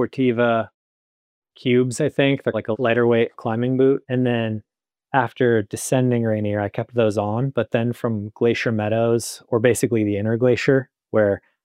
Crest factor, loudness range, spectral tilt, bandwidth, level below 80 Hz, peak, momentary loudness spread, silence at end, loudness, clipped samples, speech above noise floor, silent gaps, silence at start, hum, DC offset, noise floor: 18 dB; 2 LU; -6 dB/octave; 15.5 kHz; -64 dBFS; -4 dBFS; 6 LU; 0.25 s; -21 LUFS; under 0.1%; over 70 dB; 0.74-1.42 s; 0 s; none; under 0.1%; under -90 dBFS